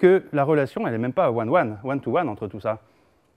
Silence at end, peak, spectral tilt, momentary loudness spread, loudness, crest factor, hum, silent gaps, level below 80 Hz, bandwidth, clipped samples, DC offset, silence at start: 0.6 s; -4 dBFS; -9 dB/octave; 9 LU; -23 LUFS; 18 dB; none; none; -64 dBFS; 8.8 kHz; under 0.1%; under 0.1%; 0 s